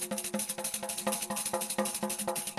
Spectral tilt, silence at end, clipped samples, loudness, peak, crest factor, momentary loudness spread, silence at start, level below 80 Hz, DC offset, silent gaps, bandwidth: -2 dB/octave; 0 s; under 0.1%; -33 LUFS; -16 dBFS; 18 dB; 2 LU; 0 s; -70 dBFS; under 0.1%; none; 13 kHz